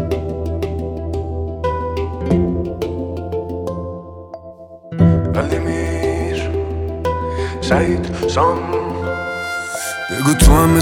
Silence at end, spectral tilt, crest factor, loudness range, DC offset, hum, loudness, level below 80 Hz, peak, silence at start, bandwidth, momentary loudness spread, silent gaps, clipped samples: 0 s; -6 dB/octave; 18 dB; 4 LU; under 0.1%; none; -19 LUFS; -26 dBFS; 0 dBFS; 0 s; 17.5 kHz; 11 LU; none; under 0.1%